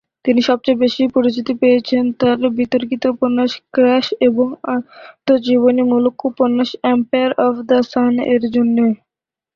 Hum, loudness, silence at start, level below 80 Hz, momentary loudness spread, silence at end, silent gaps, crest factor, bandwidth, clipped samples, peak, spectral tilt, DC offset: none; -16 LUFS; 0.25 s; -58 dBFS; 5 LU; 0.6 s; none; 14 dB; 6.8 kHz; under 0.1%; -2 dBFS; -6 dB/octave; under 0.1%